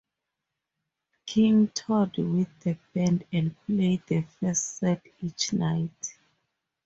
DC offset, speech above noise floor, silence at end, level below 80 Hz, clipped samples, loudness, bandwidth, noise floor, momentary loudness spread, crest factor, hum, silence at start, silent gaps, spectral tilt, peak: under 0.1%; 59 dB; 0.75 s; -62 dBFS; under 0.1%; -27 LUFS; 8 kHz; -85 dBFS; 10 LU; 16 dB; none; 1.25 s; none; -5.5 dB/octave; -12 dBFS